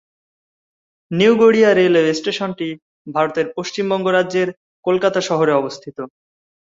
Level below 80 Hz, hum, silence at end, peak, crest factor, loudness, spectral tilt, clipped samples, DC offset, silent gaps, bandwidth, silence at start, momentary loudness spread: -62 dBFS; none; 0.6 s; -2 dBFS; 16 dB; -17 LUFS; -5.5 dB/octave; under 0.1%; under 0.1%; 2.82-3.05 s, 4.57-4.83 s; 7.8 kHz; 1.1 s; 16 LU